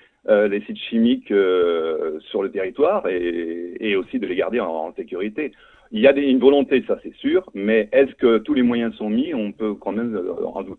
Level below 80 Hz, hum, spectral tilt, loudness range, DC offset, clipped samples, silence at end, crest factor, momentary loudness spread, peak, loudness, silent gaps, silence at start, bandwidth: -56 dBFS; none; -8 dB/octave; 5 LU; under 0.1%; under 0.1%; 0 s; 20 dB; 11 LU; -2 dBFS; -20 LUFS; none; 0.3 s; 4.2 kHz